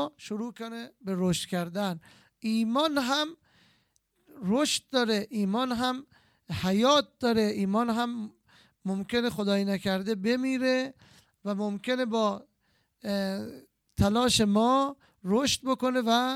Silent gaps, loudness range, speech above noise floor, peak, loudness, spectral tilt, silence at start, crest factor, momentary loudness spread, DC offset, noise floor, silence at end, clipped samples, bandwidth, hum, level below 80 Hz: none; 4 LU; 44 dB; -10 dBFS; -28 LUFS; -4.5 dB/octave; 0 s; 18 dB; 15 LU; under 0.1%; -72 dBFS; 0 s; under 0.1%; 16 kHz; none; -56 dBFS